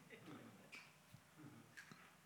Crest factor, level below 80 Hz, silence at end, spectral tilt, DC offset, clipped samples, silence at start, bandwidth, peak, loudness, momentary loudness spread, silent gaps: 20 dB; under -90 dBFS; 0 s; -4 dB/octave; under 0.1%; under 0.1%; 0 s; 19.5 kHz; -42 dBFS; -61 LUFS; 5 LU; none